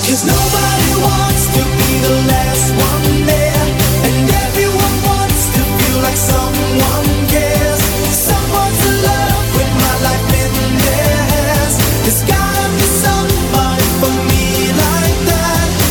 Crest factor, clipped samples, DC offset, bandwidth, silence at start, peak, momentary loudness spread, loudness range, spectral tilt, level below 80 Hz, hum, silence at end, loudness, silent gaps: 10 dB; under 0.1%; under 0.1%; over 20 kHz; 0 s; -2 dBFS; 2 LU; 1 LU; -4 dB/octave; -22 dBFS; none; 0 s; -12 LUFS; none